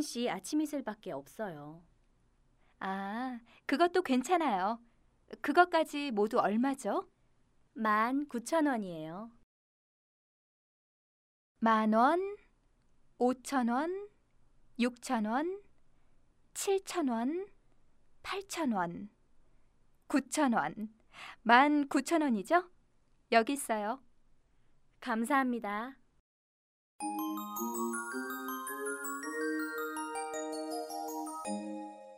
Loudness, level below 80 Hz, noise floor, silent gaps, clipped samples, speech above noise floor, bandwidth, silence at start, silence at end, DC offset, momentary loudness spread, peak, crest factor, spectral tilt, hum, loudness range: -33 LUFS; -70 dBFS; -69 dBFS; 9.43-11.55 s, 26.20-26.99 s; under 0.1%; 37 dB; 16 kHz; 0 s; 0 s; under 0.1%; 15 LU; -10 dBFS; 26 dB; -4 dB/octave; none; 8 LU